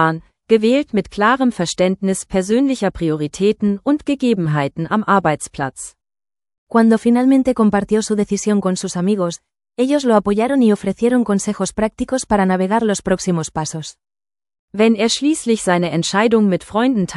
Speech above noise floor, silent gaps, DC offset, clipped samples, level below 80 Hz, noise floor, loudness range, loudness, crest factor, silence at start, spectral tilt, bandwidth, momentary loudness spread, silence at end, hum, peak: over 74 dB; 6.58-6.67 s, 14.59-14.68 s; under 0.1%; under 0.1%; -46 dBFS; under -90 dBFS; 2 LU; -17 LUFS; 16 dB; 0 s; -5.5 dB/octave; 12 kHz; 8 LU; 0 s; none; 0 dBFS